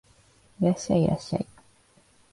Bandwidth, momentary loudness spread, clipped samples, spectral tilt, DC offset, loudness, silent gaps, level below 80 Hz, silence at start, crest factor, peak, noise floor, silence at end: 11.5 kHz; 9 LU; under 0.1%; -7 dB/octave; under 0.1%; -27 LUFS; none; -54 dBFS; 0.6 s; 18 dB; -10 dBFS; -61 dBFS; 0.9 s